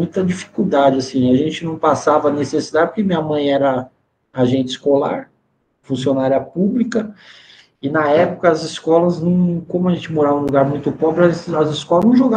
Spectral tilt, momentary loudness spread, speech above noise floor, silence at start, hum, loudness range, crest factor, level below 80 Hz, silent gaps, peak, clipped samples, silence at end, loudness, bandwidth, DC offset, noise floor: -7 dB/octave; 7 LU; 48 dB; 0 s; none; 3 LU; 16 dB; -54 dBFS; none; 0 dBFS; under 0.1%; 0 s; -17 LUFS; 9.2 kHz; under 0.1%; -64 dBFS